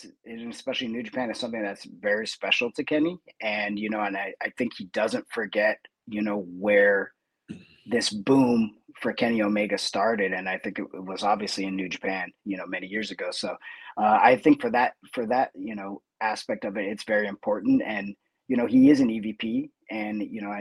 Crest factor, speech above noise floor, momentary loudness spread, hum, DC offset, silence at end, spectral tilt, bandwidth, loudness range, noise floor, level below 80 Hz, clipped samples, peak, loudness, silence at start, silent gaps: 22 dB; 19 dB; 14 LU; none; under 0.1%; 0 s; -5 dB/octave; 12 kHz; 4 LU; -45 dBFS; -68 dBFS; under 0.1%; -4 dBFS; -26 LUFS; 0 s; none